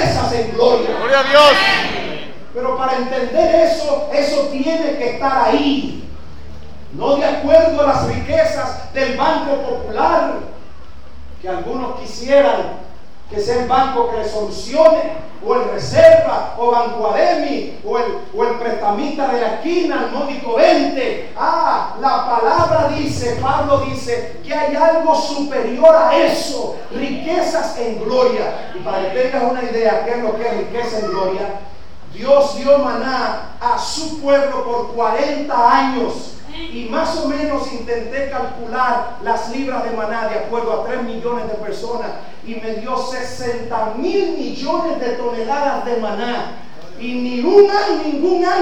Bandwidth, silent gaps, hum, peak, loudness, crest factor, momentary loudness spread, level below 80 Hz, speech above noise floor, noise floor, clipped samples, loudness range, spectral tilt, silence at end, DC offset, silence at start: 13 kHz; none; none; 0 dBFS; -17 LUFS; 16 dB; 12 LU; -42 dBFS; 24 dB; -40 dBFS; under 0.1%; 7 LU; -5 dB/octave; 0 s; 5%; 0 s